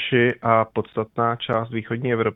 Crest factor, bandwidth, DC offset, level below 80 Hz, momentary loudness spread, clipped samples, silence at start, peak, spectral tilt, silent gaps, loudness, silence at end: 20 dB; 4 kHz; under 0.1%; -58 dBFS; 7 LU; under 0.1%; 0 s; -2 dBFS; -9 dB/octave; none; -22 LUFS; 0 s